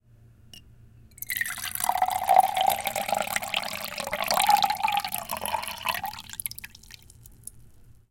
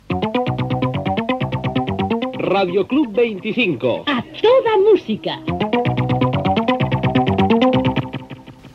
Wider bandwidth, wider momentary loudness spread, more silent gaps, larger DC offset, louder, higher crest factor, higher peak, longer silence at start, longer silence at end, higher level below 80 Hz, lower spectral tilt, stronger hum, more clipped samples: first, 17 kHz vs 7.2 kHz; first, 23 LU vs 8 LU; neither; neither; second, -26 LUFS vs -18 LUFS; first, 26 dB vs 14 dB; about the same, -4 dBFS vs -2 dBFS; first, 0.55 s vs 0.1 s; first, 0.2 s vs 0.05 s; second, -58 dBFS vs -44 dBFS; second, -1 dB/octave vs -8 dB/octave; neither; neither